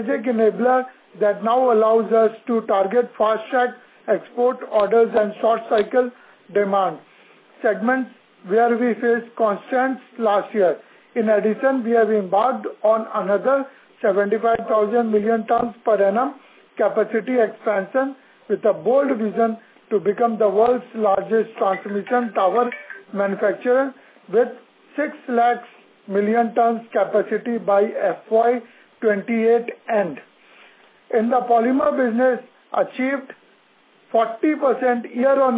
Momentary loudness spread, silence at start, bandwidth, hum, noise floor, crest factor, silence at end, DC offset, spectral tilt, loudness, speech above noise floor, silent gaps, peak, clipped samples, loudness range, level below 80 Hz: 7 LU; 0 s; 4 kHz; none; -56 dBFS; 14 dB; 0 s; under 0.1%; -10 dB/octave; -20 LUFS; 37 dB; none; -4 dBFS; under 0.1%; 2 LU; -68 dBFS